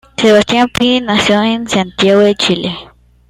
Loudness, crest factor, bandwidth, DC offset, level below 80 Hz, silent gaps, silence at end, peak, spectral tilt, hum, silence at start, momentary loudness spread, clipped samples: -11 LUFS; 12 dB; 14 kHz; under 0.1%; -42 dBFS; none; 0.45 s; 0 dBFS; -4.5 dB/octave; none; 0.2 s; 7 LU; under 0.1%